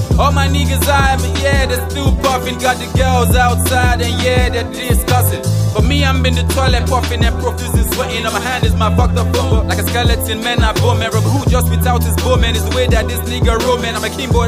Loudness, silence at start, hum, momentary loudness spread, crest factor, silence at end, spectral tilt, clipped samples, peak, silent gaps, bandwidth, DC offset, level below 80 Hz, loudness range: -14 LUFS; 0 s; none; 4 LU; 12 dB; 0 s; -5 dB/octave; under 0.1%; 0 dBFS; none; 15.5 kHz; under 0.1%; -20 dBFS; 1 LU